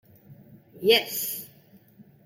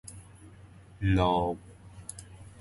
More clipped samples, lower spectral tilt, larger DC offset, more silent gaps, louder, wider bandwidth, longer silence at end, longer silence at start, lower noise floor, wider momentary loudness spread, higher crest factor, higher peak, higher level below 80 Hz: neither; second, -2 dB/octave vs -6.5 dB/octave; neither; neither; first, -24 LUFS vs -29 LUFS; first, 16.5 kHz vs 11.5 kHz; first, 0.25 s vs 0.1 s; first, 0.3 s vs 0.05 s; about the same, -55 dBFS vs -52 dBFS; second, 16 LU vs 27 LU; about the same, 24 dB vs 20 dB; first, -6 dBFS vs -12 dBFS; second, -76 dBFS vs -44 dBFS